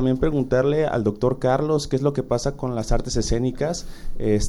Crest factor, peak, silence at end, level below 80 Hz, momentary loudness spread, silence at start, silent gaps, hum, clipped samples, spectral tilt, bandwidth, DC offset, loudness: 16 dB; -6 dBFS; 0 s; -30 dBFS; 6 LU; 0 s; none; none; under 0.1%; -6 dB/octave; 12 kHz; under 0.1%; -23 LUFS